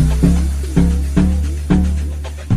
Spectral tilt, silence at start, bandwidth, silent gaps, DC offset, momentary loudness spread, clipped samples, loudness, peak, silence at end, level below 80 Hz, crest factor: -7.5 dB/octave; 0 s; 13 kHz; none; under 0.1%; 7 LU; under 0.1%; -16 LUFS; -2 dBFS; 0 s; -18 dBFS; 14 dB